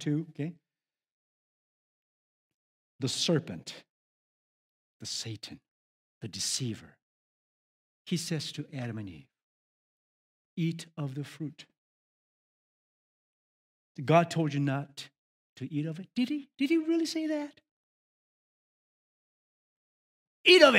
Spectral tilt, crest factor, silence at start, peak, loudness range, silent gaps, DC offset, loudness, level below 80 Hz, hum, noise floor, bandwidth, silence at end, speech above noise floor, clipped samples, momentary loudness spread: -4.5 dB/octave; 30 dB; 0 s; -4 dBFS; 9 LU; 1.11-2.99 s, 3.89-5.00 s, 5.68-6.21 s, 7.02-8.05 s, 9.43-10.57 s, 11.78-13.95 s, 15.18-15.56 s, 17.71-20.44 s; under 0.1%; -31 LUFS; -80 dBFS; none; under -90 dBFS; 16 kHz; 0 s; over 61 dB; under 0.1%; 19 LU